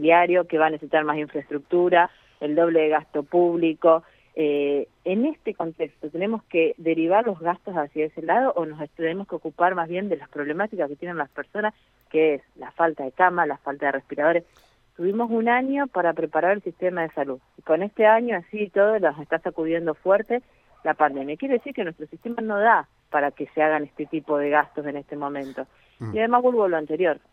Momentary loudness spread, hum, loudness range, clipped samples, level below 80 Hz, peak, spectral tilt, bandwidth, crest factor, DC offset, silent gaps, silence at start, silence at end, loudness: 11 LU; none; 4 LU; under 0.1%; -66 dBFS; -4 dBFS; -8.5 dB/octave; 4.2 kHz; 20 dB; under 0.1%; none; 0 s; 0.15 s; -23 LUFS